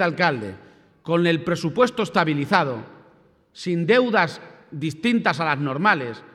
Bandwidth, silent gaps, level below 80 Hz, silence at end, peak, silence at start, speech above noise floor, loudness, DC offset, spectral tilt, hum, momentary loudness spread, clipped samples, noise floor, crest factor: 12.5 kHz; none; -64 dBFS; 0.15 s; -2 dBFS; 0 s; 35 dB; -21 LUFS; under 0.1%; -6 dB/octave; none; 14 LU; under 0.1%; -56 dBFS; 20 dB